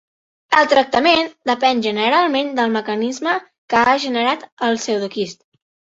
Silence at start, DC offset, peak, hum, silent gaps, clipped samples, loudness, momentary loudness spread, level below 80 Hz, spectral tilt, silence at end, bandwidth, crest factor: 0.5 s; under 0.1%; -2 dBFS; none; 3.58-3.68 s, 4.52-4.57 s; under 0.1%; -17 LUFS; 8 LU; -60 dBFS; -3.5 dB/octave; 0.6 s; 8 kHz; 16 dB